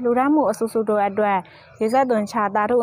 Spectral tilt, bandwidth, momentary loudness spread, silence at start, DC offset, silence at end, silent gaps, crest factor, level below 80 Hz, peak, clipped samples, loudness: -6 dB/octave; 16 kHz; 4 LU; 0 s; under 0.1%; 0 s; none; 12 dB; -62 dBFS; -8 dBFS; under 0.1%; -20 LUFS